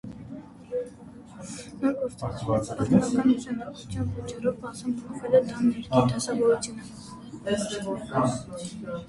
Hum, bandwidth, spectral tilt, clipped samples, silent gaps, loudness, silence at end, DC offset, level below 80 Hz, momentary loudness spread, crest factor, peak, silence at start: none; 11.5 kHz; -6 dB/octave; under 0.1%; none; -27 LUFS; 0 s; under 0.1%; -52 dBFS; 18 LU; 20 dB; -8 dBFS; 0.05 s